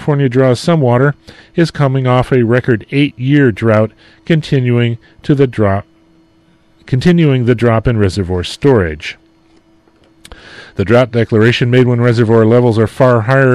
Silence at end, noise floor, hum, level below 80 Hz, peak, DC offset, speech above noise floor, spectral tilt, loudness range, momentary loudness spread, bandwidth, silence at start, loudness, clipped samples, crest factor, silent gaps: 0 s; -50 dBFS; none; -38 dBFS; 0 dBFS; under 0.1%; 39 dB; -7.5 dB/octave; 4 LU; 9 LU; 11.5 kHz; 0 s; -12 LUFS; under 0.1%; 12 dB; none